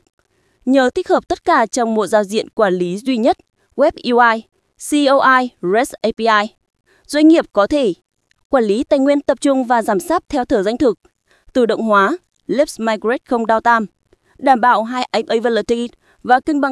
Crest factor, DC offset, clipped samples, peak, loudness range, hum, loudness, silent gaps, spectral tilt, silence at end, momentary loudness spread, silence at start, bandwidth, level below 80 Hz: 16 dB; under 0.1%; under 0.1%; 0 dBFS; 2 LU; none; -16 LUFS; 8.45-8.50 s; -4.5 dB/octave; 0 s; 8 LU; 0.65 s; 12 kHz; -50 dBFS